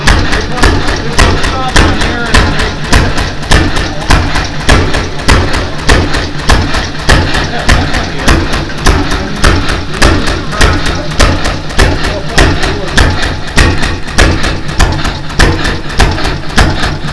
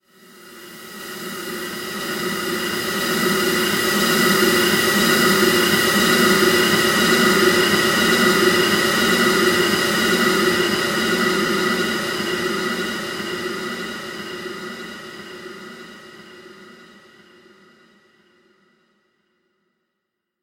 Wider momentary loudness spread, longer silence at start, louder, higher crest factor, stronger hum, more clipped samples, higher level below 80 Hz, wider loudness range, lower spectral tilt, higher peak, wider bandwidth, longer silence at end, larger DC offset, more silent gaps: second, 5 LU vs 18 LU; second, 0 s vs 0.45 s; first, -10 LUFS vs -17 LUFS; second, 8 dB vs 18 dB; neither; first, 2% vs under 0.1%; first, -12 dBFS vs -52 dBFS; second, 1 LU vs 15 LU; first, -4.5 dB/octave vs -3 dB/octave; about the same, 0 dBFS vs -2 dBFS; second, 11 kHz vs 17 kHz; second, 0 s vs 3.7 s; neither; neither